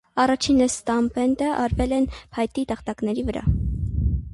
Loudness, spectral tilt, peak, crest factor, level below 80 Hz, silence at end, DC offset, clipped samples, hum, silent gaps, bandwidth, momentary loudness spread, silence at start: -23 LUFS; -5.5 dB/octave; -8 dBFS; 14 dB; -32 dBFS; 0 s; under 0.1%; under 0.1%; none; none; 11.5 kHz; 8 LU; 0.15 s